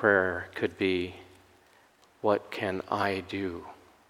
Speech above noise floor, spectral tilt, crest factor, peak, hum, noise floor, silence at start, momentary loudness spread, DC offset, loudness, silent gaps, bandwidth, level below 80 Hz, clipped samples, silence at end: 32 dB; -6 dB/octave; 22 dB; -8 dBFS; none; -61 dBFS; 0 s; 12 LU; under 0.1%; -30 LUFS; none; 16 kHz; -66 dBFS; under 0.1%; 0.35 s